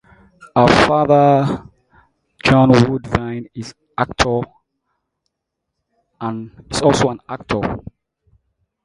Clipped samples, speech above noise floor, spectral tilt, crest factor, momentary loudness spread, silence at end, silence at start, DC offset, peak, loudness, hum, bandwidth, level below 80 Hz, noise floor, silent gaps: under 0.1%; 63 dB; -6 dB/octave; 18 dB; 18 LU; 1.05 s; 0.55 s; under 0.1%; 0 dBFS; -16 LUFS; none; 11.5 kHz; -40 dBFS; -78 dBFS; none